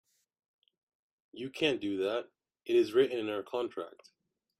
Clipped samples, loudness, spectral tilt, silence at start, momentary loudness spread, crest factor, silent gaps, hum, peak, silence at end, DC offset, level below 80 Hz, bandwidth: under 0.1%; -32 LUFS; -5 dB/octave; 1.35 s; 16 LU; 20 dB; none; none; -16 dBFS; 0.7 s; under 0.1%; -78 dBFS; 12 kHz